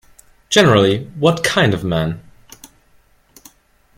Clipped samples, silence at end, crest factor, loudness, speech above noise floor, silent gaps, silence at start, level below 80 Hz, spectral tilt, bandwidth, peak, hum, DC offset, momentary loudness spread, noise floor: under 0.1%; 1.75 s; 18 dB; -15 LUFS; 40 dB; none; 0.5 s; -46 dBFS; -5 dB/octave; 16 kHz; 0 dBFS; none; under 0.1%; 10 LU; -54 dBFS